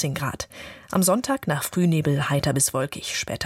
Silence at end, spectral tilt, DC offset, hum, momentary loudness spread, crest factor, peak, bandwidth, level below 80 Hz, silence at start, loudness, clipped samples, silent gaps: 0 s; -4.5 dB/octave; under 0.1%; none; 9 LU; 16 dB; -8 dBFS; 16.5 kHz; -52 dBFS; 0 s; -23 LUFS; under 0.1%; none